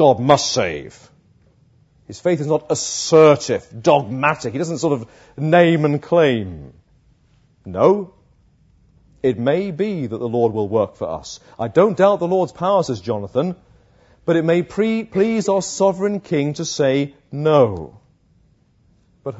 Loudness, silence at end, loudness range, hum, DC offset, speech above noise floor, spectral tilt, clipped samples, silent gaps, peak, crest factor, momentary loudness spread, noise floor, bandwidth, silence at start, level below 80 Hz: -18 LUFS; 0 s; 5 LU; none; under 0.1%; 39 dB; -5.5 dB/octave; under 0.1%; none; 0 dBFS; 18 dB; 13 LU; -57 dBFS; 8 kHz; 0 s; -56 dBFS